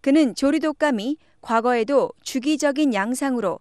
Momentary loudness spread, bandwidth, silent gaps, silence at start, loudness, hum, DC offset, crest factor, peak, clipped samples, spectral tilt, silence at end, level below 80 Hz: 7 LU; 13 kHz; none; 0.05 s; -21 LUFS; none; 0.1%; 14 dB; -6 dBFS; under 0.1%; -4 dB/octave; 0.05 s; -60 dBFS